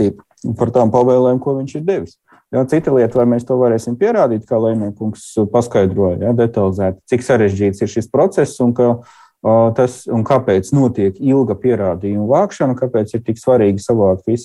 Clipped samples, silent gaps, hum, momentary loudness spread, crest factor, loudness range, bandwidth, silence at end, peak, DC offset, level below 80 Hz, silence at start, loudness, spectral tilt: under 0.1%; none; none; 7 LU; 12 dB; 1 LU; 12 kHz; 0 s; -2 dBFS; under 0.1%; -50 dBFS; 0 s; -15 LUFS; -8 dB/octave